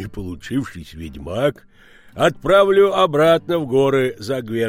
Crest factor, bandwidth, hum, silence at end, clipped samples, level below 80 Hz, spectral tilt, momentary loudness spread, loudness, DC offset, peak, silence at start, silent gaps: 14 dB; 16.5 kHz; none; 0 s; under 0.1%; -44 dBFS; -6 dB/octave; 17 LU; -17 LUFS; under 0.1%; -4 dBFS; 0 s; none